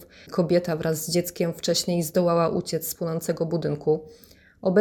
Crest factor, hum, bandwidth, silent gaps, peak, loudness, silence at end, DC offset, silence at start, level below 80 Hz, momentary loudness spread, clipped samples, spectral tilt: 16 dB; none; 17 kHz; none; -8 dBFS; -25 LUFS; 0 s; under 0.1%; 0 s; -58 dBFS; 6 LU; under 0.1%; -5 dB/octave